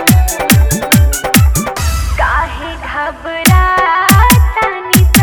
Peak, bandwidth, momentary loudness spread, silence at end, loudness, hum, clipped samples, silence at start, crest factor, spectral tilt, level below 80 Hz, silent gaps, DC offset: 0 dBFS; over 20 kHz; 11 LU; 0 s; -11 LUFS; none; 0.5%; 0 s; 10 dB; -4.5 dB/octave; -16 dBFS; none; under 0.1%